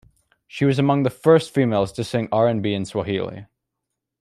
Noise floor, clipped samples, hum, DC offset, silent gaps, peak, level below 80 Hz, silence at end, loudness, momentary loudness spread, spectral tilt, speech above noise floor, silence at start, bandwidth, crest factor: -81 dBFS; under 0.1%; none; under 0.1%; none; -4 dBFS; -56 dBFS; 0.75 s; -20 LUFS; 10 LU; -7 dB/octave; 61 dB; 0.55 s; 13.5 kHz; 18 dB